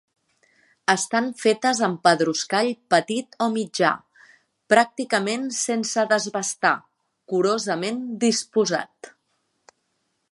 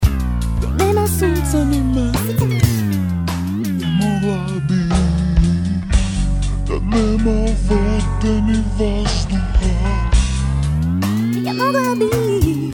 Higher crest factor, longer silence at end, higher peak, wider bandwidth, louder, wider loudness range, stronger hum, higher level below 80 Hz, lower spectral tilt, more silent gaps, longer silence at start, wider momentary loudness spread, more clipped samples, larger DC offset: first, 22 dB vs 16 dB; first, 1.25 s vs 0 s; about the same, -2 dBFS vs 0 dBFS; second, 11.5 kHz vs 19 kHz; second, -22 LUFS vs -18 LUFS; about the same, 3 LU vs 1 LU; neither; second, -76 dBFS vs -20 dBFS; second, -3 dB/octave vs -6.5 dB/octave; neither; first, 0.9 s vs 0 s; first, 7 LU vs 4 LU; neither; neither